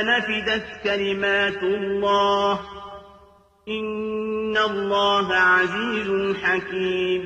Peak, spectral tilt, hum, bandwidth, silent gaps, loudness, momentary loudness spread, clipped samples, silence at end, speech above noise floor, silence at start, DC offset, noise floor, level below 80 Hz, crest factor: -8 dBFS; -4.5 dB/octave; none; 8.6 kHz; none; -22 LUFS; 10 LU; under 0.1%; 0 s; 31 dB; 0 s; under 0.1%; -53 dBFS; -54 dBFS; 14 dB